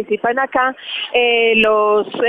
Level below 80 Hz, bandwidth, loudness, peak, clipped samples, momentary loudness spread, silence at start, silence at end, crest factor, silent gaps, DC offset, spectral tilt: -54 dBFS; 4.8 kHz; -15 LUFS; -2 dBFS; under 0.1%; 7 LU; 0 s; 0 s; 14 dB; none; under 0.1%; -5.5 dB/octave